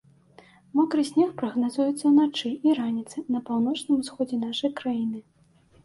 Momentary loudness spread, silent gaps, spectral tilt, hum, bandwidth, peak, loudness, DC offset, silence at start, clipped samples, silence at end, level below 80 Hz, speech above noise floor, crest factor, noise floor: 9 LU; none; -5 dB/octave; none; 11.5 kHz; -10 dBFS; -25 LUFS; under 0.1%; 0.75 s; under 0.1%; 0.65 s; -70 dBFS; 34 dB; 14 dB; -59 dBFS